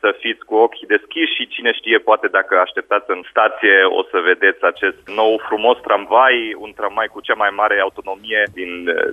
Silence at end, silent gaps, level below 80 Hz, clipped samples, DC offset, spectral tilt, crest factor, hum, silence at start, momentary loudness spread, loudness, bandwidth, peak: 0 s; none; -62 dBFS; under 0.1%; under 0.1%; -4.5 dB/octave; 16 dB; none; 0.05 s; 9 LU; -16 LUFS; 4.6 kHz; 0 dBFS